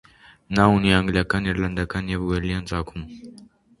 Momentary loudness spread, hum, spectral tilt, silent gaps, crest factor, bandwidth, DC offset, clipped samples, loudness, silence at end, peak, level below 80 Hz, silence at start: 17 LU; none; -6.5 dB/octave; none; 22 dB; 11.5 kHz; under 0.1%; under 0.1%; -22 LUFS; 0.35 s; 0 dBFS; -38 dBFS; 0.5 s